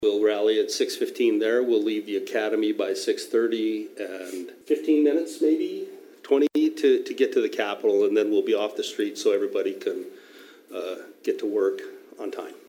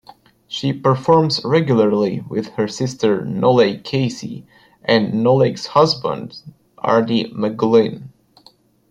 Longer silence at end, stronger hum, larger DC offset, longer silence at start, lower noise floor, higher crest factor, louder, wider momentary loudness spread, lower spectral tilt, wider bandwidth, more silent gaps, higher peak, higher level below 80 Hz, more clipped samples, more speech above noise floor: second, 0.1 s vs 0.85 s; neither; neither; second, 0 s vs 0.5 s; about the same, -49 dBFS vs -52 dBFS; about the same, 16 dB vs 16 dB; second, -25 LUFS vs -17 LUFS; about the same, 14 LU vs 12 LU; second, -3.5 dB/octave vs -6.5 dB/octave; first, 16.5 kHz vs 10.5 kHz; neither; second, -8 dBFS vs -2 dBFS; second, -82 dBFS vs -58 dBFS; neither; second, 25 dB vs 35 dB